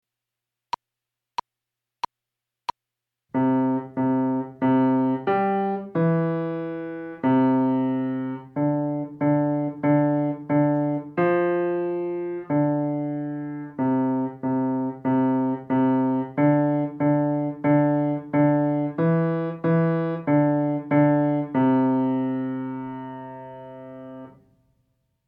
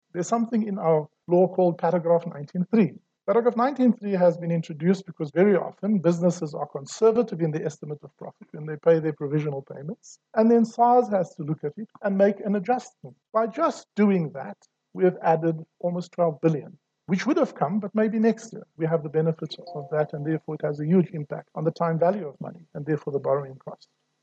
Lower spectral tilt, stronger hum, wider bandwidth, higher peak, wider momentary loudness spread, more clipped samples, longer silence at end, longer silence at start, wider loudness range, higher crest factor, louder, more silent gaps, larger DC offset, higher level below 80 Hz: first, -10 dB/octave vs -7.5 dB/octave; neither; second, 6 kHz vs 8.2 kHz; about the same, -8 dBFS vs -8 dBFS; about the same, 15 LU vs 15 LU; neither; first, 1 s vs 0.5 s; first, 3.35 s vs 0.15 s; about the same, 5 LU vs 3 LU; about the same, 16 dB vs 18 dB; about the same, -23 LUFS vs -24 LUFS; neither; neither; first, -70 dBFS vs -76 dBFS